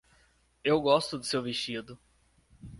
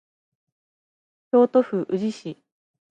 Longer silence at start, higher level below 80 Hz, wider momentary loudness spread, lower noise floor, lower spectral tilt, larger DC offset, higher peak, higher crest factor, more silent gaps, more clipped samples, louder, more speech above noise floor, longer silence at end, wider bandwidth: second, 0.65 s vs 1.35 s; first, -62 dBFS vs -78 dBFS; second, 13 LU vs 17 LU; second, -66 dBFS vs under -90 dBFS; second, -4.5 dB/octave vs -7.5 dB/octave; neither; second, -10 dBFS vs -6 dBFS; about the same, 22 dB vs 18 dB; neither; neither; second, -29 LUFS vs -22 LUFS; second, 37 dB vs over 69 dB; second, 0 s vs 0.55 s; first, 11.5 kHz vs 8.6 kHz